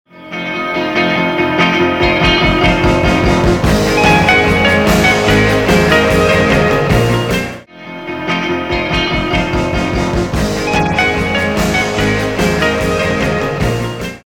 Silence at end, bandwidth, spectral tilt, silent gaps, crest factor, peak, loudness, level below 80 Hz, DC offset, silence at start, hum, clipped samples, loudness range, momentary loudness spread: 0.05 s; 18 kHz; -5 dB/octave; none; 12 dB; 0 dBFS; -12 LUFS; -26 dBFS; under 0.1%; 0.15 s; none; under 0.1%; 5 LU; 8 LU